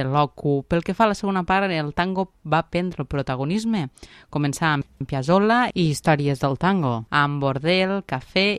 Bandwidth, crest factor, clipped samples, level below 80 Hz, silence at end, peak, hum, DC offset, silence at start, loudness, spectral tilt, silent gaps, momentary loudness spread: 14 kHz; 18 dB; under 0.1%; -48 dBFS; 0 s; -4 dBFS; none; under 0.1%; 0 s; -22 LUFS; -6 dB/octave; none; 7 LU